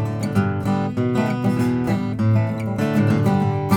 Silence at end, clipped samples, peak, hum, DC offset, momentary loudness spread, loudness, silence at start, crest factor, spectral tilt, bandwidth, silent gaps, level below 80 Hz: 0 s; under 0.1%; -4 dBFS; none; under 0.1%; 4 LU; -20 LUFS; 0 s; 14 dB; -8 dB/octave; 15 kHz; none; -50 dBFS